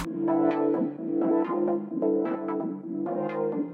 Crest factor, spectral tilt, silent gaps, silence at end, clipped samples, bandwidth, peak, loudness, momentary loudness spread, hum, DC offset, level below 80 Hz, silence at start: 14 dB; -8.5 dB/octave; none; 0 s; under 0.1%; 4.5 kHz; -12 dBFS; -27 LUFS; 7 LU; none; under 0.1%; -62 dBFS; 0 s